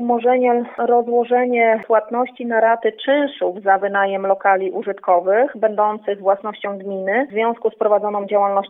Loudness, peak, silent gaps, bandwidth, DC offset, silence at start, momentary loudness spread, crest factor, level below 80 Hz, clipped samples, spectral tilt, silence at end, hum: -18 LUFS; -2 dBFS; none; 3.9 kHz; under 0.1%; 0 s; 6 LU; 16 dB; -78 dBFS; under 0.1%; -8.5 dB/octave; 0 s; none